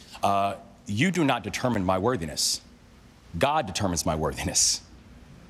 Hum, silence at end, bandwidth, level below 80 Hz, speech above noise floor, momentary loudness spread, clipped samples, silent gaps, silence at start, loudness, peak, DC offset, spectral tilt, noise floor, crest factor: none; 0.05 s; 15 kHz; -48 dBFS; 27 dB; 8 LU; under 0.1%; none; 0 s; -25 LUFS; -10 dBFS; under 0.1%; -3.5 dB/octave; -52 dBFS; 18 dB